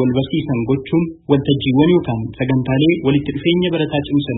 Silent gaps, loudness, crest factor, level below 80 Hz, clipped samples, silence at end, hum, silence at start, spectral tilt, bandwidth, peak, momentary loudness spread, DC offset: none; -17 LUFS; 16 dB; -42 dBFS; under 0.1%; 0 s; none; 0 s; -12.5 dB/octave; 4.1 kHz; 0 dBFS; 5 LU; under 0.1%